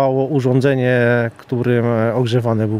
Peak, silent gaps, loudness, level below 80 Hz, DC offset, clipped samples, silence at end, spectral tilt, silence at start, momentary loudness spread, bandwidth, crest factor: -2 dBFS; none; -16 LUFS; -56 dBFS; under 0.1%; under 0.1%; 0 s; -8 dB/octave; 0 s; 4 LU; 10.5 kHz; 14 dB